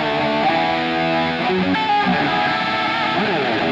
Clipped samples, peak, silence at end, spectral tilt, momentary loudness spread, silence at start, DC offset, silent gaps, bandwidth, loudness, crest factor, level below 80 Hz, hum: under 0.1%; -8 dBFS; 0 s; -6 dB/octave; 2 LU; 0 s; under 0.1%; none; 10 kHz; -18 LUFS; 12 dB; -50 dBFS; none